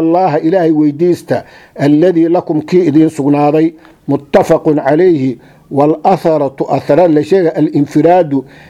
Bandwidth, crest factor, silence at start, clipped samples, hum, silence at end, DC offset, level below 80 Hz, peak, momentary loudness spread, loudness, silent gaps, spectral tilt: 12.5 kHz; 10 dB; 0 s; 0.2%; none; 0.25 s; under 0.1%; -50 dBFS; 0 dBFS; 7 LU; -11 LUFS; none; -8 dB/octave